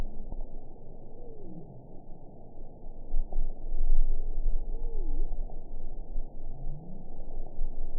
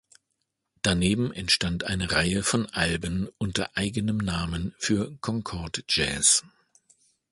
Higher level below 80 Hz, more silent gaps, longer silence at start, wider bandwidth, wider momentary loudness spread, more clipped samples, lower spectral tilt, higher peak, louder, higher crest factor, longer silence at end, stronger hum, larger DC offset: first, -30 dBFS vs -44 dBFS; neither; second, 0 s vs 0.85 s; second, 0.9 kHz vs 11.5 kHz; first, 15 LU vs 10 LU; neither; first, -15 dB/octave vs -3 dB/octave; second, -10 dBFS vs -6 dBFS; second, -41 LUFS vs -26 LUFS; second, 16 dB vs 22 dB; second, 0 s vs 0.85 s; neither; first, 0.2% vs under 0.1%